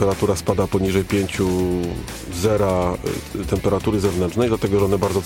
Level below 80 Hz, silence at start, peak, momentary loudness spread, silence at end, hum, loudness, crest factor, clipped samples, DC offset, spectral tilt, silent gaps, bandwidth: -38 dBFS; 0 s; -4 dBFS; 7 LU; 0 s; none; -21 LUFS; 16 dB; under 0.1%; under 0.1%; -6 dB/octave; none; 17 kHz